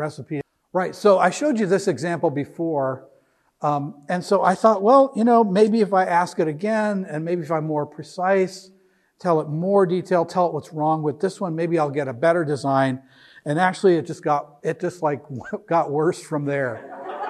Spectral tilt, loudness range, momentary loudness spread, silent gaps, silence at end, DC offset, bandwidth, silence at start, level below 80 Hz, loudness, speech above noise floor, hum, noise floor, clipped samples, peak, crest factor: -6.5 dB/octave; 5 LU; 11 LU; none; 0 s; under 0.1%; 12.5 kHz; 0 s; -72 dBFS; -21 LUFS; 40 dB; none; -60 dBFS; under 0.1%; -2 dBFS; 18 dB